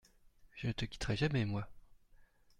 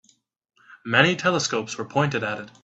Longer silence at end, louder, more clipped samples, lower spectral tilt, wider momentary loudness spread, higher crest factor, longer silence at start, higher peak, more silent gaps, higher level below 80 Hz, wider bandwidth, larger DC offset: first, 0.35 s vs 0.15 s; second, -38 LUFS vs -22 LUFS; neither; first, -6 dB/octave vs -4 dB/octave; first, 14 LU vs 10 LU; about the same, 20 dB vs 24 dB; second, 0.55 s vs 0.7 s; second, -20 dBFS vs 0 dBFS; neither; first, -54 dBFS vs -64 dBFS; first, 11.5 kHz vs 8.2 kHz; neither